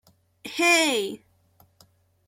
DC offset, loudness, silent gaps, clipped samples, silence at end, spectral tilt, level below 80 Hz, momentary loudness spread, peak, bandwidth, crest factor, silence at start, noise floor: under 0.1%; -21 LUFS; none; under 0.1%; 1.1 s; -1 dB/octave; -74 dBFS; 24 LU; -6 dBFS; 16.5 kHz; 20 dB; 0.45 s; -61 dBFS